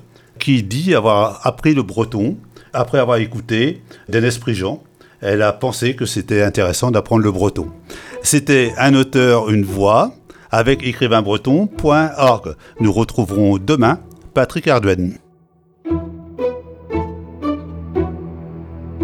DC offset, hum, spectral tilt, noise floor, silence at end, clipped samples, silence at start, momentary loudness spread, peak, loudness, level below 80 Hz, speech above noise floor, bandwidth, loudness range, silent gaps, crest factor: under 0.1%; none; -5.5 dB/octave; -53 dBFS; 0 s; under 0.1%; 0.35 s; 13 LU; 0 dBFS; -16 LUFS; -40 dBFS; 38 dB; 17.5 kHz; 6 LU; none; 16 dB